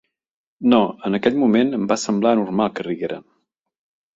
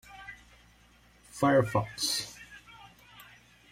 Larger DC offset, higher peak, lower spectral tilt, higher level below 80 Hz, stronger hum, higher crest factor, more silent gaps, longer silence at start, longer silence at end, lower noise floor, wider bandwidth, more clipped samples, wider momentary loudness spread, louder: neither; first, -2 dBFS vs -12 dBFS; first, -5.5 dB/octave vs -4 dB/octave; about the same, -62 dBFS vs -62 dBFS; neither; about the same, 18 dB vs 22 dB; neither; first, 0.6 s vs 0.1 s; first, 0.95 s vs 0.5 s; first, -70 dBFS vs -61 dBFS; second, 8 kHz vs 16 kHz; neither; second, 9 LU vs 27 LU; first, -19 LUFS vs -29 LUFS